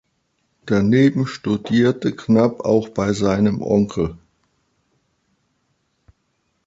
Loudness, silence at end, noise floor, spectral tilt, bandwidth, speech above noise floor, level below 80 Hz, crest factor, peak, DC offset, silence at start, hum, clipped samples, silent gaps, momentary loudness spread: -18 LUFS; 2.5 s; -69 dBFS; -7.5 dB/octave; 7.8 kHz; 51 dB; -48 dBFS; 16 dB; -4 dBFS; under 0.1%; 0.65 s; none; under 0.1%; none; 8 LU